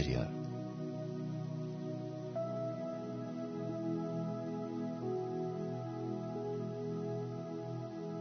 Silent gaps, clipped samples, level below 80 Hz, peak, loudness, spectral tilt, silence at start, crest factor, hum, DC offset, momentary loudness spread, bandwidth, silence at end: none; under 0.1%; -60 dBFS; -20 dBFS; -41 LUFS; -8 dB/octave; 0 s; 20 dB; none; under 0.1%; 4 LU; 6.4 kHz; 0 s